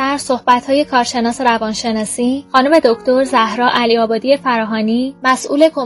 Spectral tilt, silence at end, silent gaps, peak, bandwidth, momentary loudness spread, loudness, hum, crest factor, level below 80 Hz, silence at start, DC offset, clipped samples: -3.5 dB/octave; 0 s; none; 0 dBFS; 12 kHz; 5 LU; -14 LUFS; none; 14 dB; -52 dBFS; 0 s; under 0.1%; under 0.1%